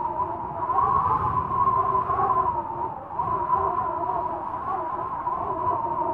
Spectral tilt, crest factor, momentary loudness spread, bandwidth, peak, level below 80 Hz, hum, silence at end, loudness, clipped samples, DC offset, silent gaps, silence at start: -9.5 dB/octave; 14 dB; 8 LU; 4.4 kHz; -10 dBFS; -48 dBFS; none; 0 s; -25 LUFS; under 0.1%; under 0.1%; none; 0 s